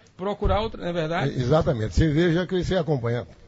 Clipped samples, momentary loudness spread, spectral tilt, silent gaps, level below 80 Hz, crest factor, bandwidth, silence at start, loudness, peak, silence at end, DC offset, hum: under 0.1%; 7 LU; -7 dB/octave; none; -34 dBFS; 16 dB; 8 kHz; 0.2 s; -24 LUFS; -8 dBFS; 0.05 s; under 0.1%; none